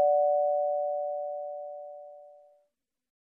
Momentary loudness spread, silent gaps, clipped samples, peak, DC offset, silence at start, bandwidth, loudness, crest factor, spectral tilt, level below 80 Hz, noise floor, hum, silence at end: 20 LU; none; under 0.1%; -16 dBFS; under 0.1%; 0 s; 0.9 kHz; -29 LUFS; 14 dB; -5.5 dB/octave; under -90 dBFS; -77 dBFS; none; 1 s